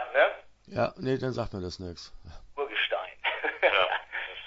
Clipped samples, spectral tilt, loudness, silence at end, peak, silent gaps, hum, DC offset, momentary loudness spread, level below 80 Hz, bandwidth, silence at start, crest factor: under 0.1%; -5 dB/octave; -29 LUFS; 0 s; -10 dBFS; none; none; under 0.1%; 17 LU; -54 dBFS; 8 kHz; 0 s; 20 dB